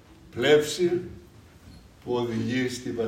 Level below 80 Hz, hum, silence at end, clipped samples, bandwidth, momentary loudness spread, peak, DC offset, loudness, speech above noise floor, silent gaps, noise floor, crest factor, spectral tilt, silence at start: -56 dBFS; none; 0 s; under 0.1%; 16 kHz; 20 LU; -6 dBFS; under 0.1%; -25 LUFS; 25 dB; none; -50 dBFS; 20 dB; -5 dB/octave; 0.1 s